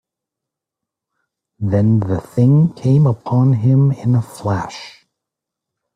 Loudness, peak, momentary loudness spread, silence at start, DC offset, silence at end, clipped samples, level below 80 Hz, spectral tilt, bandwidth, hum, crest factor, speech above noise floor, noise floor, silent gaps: -16 LUFS; -2 dBFS; 9 LU; 1.6 s; under 0.1%; 1.05 s; under 0.1%; -52 dBFS; -9 dB/octave; 10.5 kHz; none; 14 dB; 69 dB; -83 dBFS; none